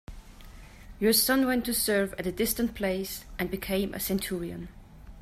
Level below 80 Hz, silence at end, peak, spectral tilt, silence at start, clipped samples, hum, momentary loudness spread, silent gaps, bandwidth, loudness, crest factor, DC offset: -48 dBFS; 0 s; -12 dBFS; -3.5 dB/octave; 0.1 s; under 0.1%; none; 12 LU; none; 16 kHz; -28 LUFS; 18 dB; under 0.1%